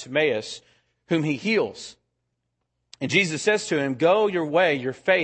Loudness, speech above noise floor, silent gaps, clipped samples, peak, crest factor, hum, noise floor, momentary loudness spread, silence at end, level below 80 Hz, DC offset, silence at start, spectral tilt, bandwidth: -23 LUFS; 55 dB; none; under 0.1%; -6 dBFS; 18 dB; none; -78 dBFS; 14 LU; 0 s; -70 dBFS; under 0.1%; 0 s; -4.5 dB/octave; 8.8 kHz